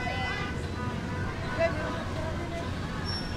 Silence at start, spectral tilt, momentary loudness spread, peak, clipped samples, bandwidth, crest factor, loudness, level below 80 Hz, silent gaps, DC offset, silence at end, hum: 0 s; -6 dB/octave; 5 LU; -14 dBFS; under 0.1%; 13.5 kHz; 18 dB; -32 LUFS; -42 dBFS; none; under 0.1%; 0 s; none